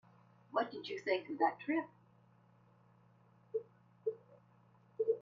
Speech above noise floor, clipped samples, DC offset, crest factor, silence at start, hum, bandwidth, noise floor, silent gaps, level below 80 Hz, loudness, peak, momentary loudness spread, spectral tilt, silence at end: 30 dB; under 0.1%; under 0.1%; 22 dB; 0.5 s; none; 7.2 kHz; -67 dBFS; none; -90 dBFS; -39 LUFS; -18 dBFS; 12 LU; -2.5 dB/octave; 0 s